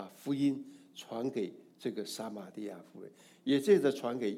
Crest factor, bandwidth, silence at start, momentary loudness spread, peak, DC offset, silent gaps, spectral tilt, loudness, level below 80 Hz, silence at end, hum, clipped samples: 20 dB; 16 kHz; 0 s; 22 LU; -14 dBFS; under 0.1%; none; -5.5 dB/octave; -34 LUFS; -86 dBFS; 0 s; none; under 0.1%